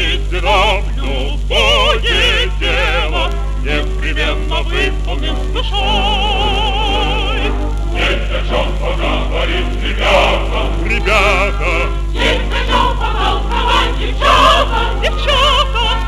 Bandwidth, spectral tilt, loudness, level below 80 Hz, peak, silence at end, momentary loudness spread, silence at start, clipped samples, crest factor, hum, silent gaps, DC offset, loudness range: 11.5 kHz; -4.5 dB/octave; -14 LUFS; -16 dBFS; -2 dBFS; 0 s; 8 LU; 0 s; under 0.1%; 12 dB; 50 Hz at -15 dBFS; none; under 0.1%; 3 LU